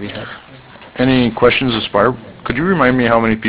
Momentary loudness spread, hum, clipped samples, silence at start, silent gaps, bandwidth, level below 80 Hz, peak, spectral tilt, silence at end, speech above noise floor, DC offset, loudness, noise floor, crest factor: 17 LU; none; under 0.1%; 0 s; none; 4 kHz; -40 dBFS; 0 dBFS; -10 dB/octave; 0 s; 24 dB; under 0.1%; -14 LUFS; -38 dBFS; 16 dB